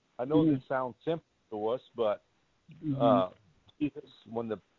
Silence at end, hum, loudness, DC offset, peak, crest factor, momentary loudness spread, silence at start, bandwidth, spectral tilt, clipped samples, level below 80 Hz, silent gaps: 0.2 s; none; -32 LUFS; under 0.1%; -12 dBFS; 20 dB; 13 LU; 0.2 s; 4.4 kHz; -9.5 dB/octave; under 0.1%; -66 dBFS; none